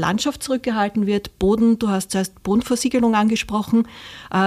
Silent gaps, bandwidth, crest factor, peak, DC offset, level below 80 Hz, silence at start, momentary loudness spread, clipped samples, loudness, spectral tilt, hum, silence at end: none; 15 kHz; 12 dB; -8 dBFS; under 0.1%; -44 dBFS; 0 s; 7 LU; under 0.1%; -20 LUFS; -5 dB/octave; none; 0 s